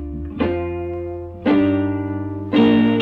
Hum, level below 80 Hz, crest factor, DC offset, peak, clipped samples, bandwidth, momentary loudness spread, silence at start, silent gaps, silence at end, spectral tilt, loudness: 50 Hz at -50 dBFS; -38 dBFS; 14 dB; under 0.1%; -4 dBFS; under 0.1%; 4.9 kHz; 13 LU; 0 s; none; 0 s; -9 dB/octave; -19 LUFS